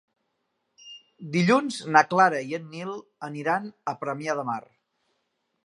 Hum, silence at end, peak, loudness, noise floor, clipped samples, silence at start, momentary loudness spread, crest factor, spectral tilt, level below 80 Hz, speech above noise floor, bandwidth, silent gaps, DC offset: none; 1.05 s; -4 dBFS; -25 LUFS; -77 dBFS; under 0.1%; 0.85 s; 17 LU; 24 dB; -5.5 dB/octave; -78 dBFS; 52 dB; 11.5 kHz; none; under 0.1%